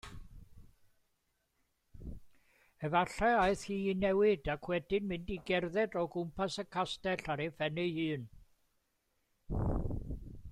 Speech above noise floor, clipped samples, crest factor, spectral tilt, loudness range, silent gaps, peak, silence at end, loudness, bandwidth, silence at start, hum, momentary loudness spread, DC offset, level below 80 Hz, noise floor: 46 dB; under 0.1%; 18 dB; -6 dB/octave; 6 LU; none; -18 dBFS; 0 s; -35 LUFS; 13.5 kHz; 0.05 s; none; 17 LU; under 0.1%; -50 dBFS; -80 dBFS